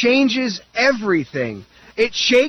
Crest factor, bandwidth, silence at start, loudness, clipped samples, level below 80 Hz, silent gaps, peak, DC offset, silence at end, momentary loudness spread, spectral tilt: 14 dB; 8.4 kHz; 0 s; -18 LUFS; under 0.1%; -54 dBFS; none; -4 dBFS; under 0.1%; 0 s; 12 LU; -4 dB/octave